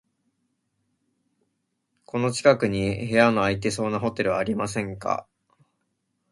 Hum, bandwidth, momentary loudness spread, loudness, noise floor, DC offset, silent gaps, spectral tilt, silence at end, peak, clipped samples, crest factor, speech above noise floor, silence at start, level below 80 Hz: none; 11.5 kHz; 9 LU; -24 LUFS; -76 dBFS; under 0.1%; none; -5.5 dB/octave; 1.1 s; -4 dBFS; under 0.1%; 24 dB; 53 dB; 2.15 s; -54 dBFS